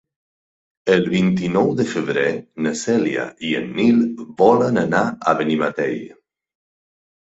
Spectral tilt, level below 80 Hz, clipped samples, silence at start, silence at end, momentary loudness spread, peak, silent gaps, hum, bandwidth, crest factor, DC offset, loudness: -6 dB/octave; -58 dBFS; under 0.1%; 0.85 s; 1.2 s; 8 LU; 0 dBFS; none; none; 8 kHz; 18 dB; under 0.1%; -19 LUFS